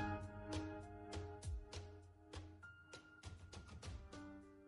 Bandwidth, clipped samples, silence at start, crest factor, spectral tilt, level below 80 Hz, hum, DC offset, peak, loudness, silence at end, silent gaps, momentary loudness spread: 11.5 kHz; under 0.1%; 0 s; 20 dB; -5.5 dB/octave; -58 dBFS; none; under 0.1%; -32 dBFS; -53 LUFS; 0 s; none; 11 LU